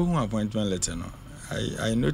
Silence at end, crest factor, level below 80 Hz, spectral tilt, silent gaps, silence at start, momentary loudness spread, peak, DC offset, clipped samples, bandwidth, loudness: 0 s; 14 dB; -42 dBFS; -5 dB/octave; none; 0 s; 12 LU; -12 dBFS; under 0.1%; under 0.1%; 16 kHz; -28 LUFS